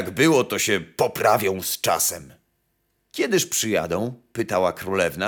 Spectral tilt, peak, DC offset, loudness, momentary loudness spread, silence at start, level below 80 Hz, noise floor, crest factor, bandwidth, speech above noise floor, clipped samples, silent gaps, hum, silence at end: -3.5 dB/octave; -6 dBFS; under 0.1%; -22 LUFS; 9 LU; 0 s; -58 dBFS; -71 dBFS; 18 dB; over 20 kHz; 49 dB; under 0.1%; none; none; 0 s